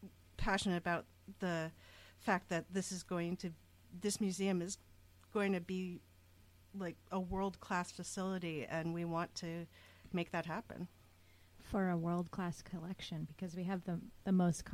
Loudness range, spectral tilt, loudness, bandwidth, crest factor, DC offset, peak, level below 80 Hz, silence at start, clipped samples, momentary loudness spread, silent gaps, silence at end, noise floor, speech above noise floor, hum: 3 LU; -5.5 dB/octave; -41 LUFS; 15.5 kHz; 20 dB; under 0.1%; -22 dBFS; -60 dBFS; 0 s; under 0.1%; 13 LU; none; 0 s; -65 dBFS; 25 dB; none